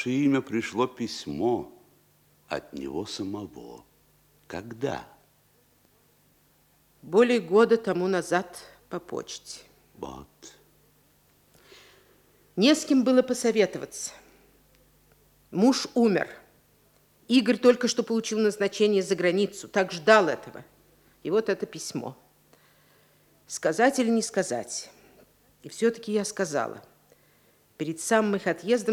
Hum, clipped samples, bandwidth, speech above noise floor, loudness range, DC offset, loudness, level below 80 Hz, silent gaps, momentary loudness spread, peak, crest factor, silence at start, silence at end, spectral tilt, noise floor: 50 Hz at -70 dBFS; under 0.1%; 17.5 kHz; 38 dB; 13 LU; under 0.1%; -26 LUFS; -68 dBFS; none; 19 LU; -4 dBFS; 24 dB; 0 s; 0 s; -4.5 dB/octave; -64 dBFS